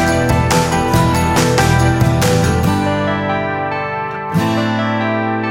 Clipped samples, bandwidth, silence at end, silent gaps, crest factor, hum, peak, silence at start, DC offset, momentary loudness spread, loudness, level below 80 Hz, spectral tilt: under 0.1%; 16.5 kHz; 0 s; none; 14 dB; none; 0 dBFS; 0 s; under 0.1%; 6 LU; -15 LUFS; -30 dBFS; -5.5 dB/octave